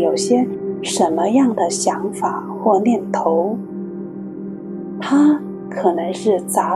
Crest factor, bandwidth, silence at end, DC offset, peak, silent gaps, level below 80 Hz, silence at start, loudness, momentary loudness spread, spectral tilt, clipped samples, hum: 16 dB; 13.5 kHz; 0 s; under 0.1%; -2 dBFS; none; -64 dBFS; 0 s; -18 LUFS; 14 LU; -5 dB/octave; under 0.1%; none